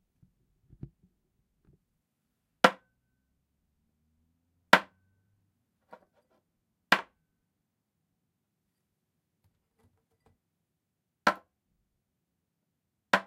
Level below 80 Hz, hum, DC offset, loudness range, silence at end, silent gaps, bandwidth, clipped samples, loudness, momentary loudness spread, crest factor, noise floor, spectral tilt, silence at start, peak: -74 dBFS; none; under 0.1%; 8 LU; 0.05 s; none; 16 kHz; under 0.1%; -27 LUFS; 6 LU; 36 dB; -84 dBFS; -3.5 dB/octave; 2.65 s; 0 dBFS